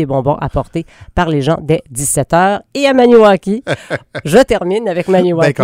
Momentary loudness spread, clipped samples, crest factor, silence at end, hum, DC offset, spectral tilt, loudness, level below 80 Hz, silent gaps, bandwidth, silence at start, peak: 12 LU; 0.3%; 12 dB; 0 s; none; under 0.1%; -5.5 dB/octave; -13 LUFS; -34 dBFS; none; 16.5 kHz; 0 s; 0 dBFS